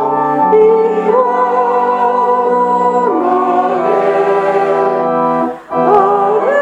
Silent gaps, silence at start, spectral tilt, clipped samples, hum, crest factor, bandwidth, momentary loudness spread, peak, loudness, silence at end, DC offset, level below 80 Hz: none; 0 s; -7 dB/octave; under 0.1%; none; 12 dB; 8.4 kHz; 4 LU; 0 dBFS; -12 LUFS; 0 s; under 0.1%; -58 dBFS